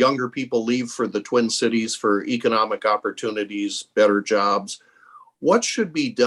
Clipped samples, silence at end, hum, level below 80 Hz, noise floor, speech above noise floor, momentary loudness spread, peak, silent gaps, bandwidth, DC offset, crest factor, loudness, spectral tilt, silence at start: under 0.1%; 0 s; none; -70 dBFS; -50 dBFS; 29 dB; 7 LU; -4 dBFS; none; 12 kHz; under 0.1%; 18 dB; -22 LUFS; -3.5 dB/octave; 0 s